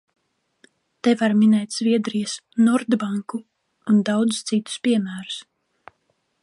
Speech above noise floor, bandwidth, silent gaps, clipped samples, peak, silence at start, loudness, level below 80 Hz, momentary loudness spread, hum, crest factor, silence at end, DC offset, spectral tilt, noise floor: 50 dB; 11.5 kHz; none; under 0.1%; -6 dBFS; 1.05 s; -21 LUFS; -72 dBFS; 15 LU; none; 16 dB; 1 s; under 0.1%; -5 dB/octave; -70 dBFS